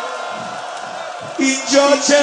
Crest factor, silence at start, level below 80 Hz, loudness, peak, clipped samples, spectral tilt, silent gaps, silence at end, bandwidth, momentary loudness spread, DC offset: 16 dB; 0 s; -74 dBFS; -18 LUFS; 0 dBFS; under 0.1%; -1.5 dB/octave; none; 0 s; 10.5 kHz; 15 LU; under 0.1%